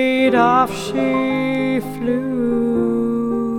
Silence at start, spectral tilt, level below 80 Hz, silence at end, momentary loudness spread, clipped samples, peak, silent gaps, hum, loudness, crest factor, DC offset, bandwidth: 0 s; -6 dB/octave; -48 dBFS; 0 s; 7 LU; under 0.1%; -2 dBFS; none; none; -18 LUFS; 16 dB; under 0.1%; 15.5 kHz